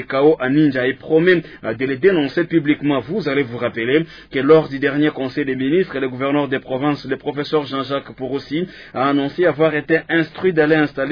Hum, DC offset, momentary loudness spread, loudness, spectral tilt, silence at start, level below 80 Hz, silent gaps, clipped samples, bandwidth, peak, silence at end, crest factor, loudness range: none; under 0.1%; 9 LU; -18 LUFS; -8.5 dB/octave; 0 s; -54 dBFS; none; under 0.1%; 5.4 kHz; -2 dBFS; 0 s; 16 dB; 4 LU